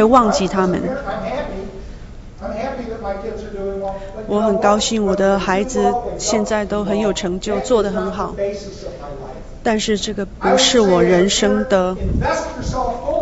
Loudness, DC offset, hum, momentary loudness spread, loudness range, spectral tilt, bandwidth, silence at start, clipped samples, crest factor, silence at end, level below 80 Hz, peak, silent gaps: -18 LUFS; under 0.1%; none; 17 LU; 8 LU; -4.5 dB/octave; 8.2 kHz; 0 s; under 0.1%; 18 dB; 0 s; -34 dBFS; 0 dBFS; none